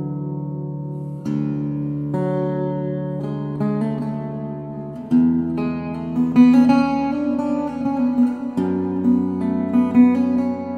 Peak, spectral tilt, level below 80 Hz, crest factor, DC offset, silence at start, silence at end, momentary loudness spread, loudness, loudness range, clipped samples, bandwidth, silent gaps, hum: -2 dBFS; -9.5 dB/octave; -52 dBFS; 16 dB; under 0.1%; 0 s; 0 s; 14 LU; -20 LUFS; 6 LU; under 0.1%; 6.6 kHz; none; none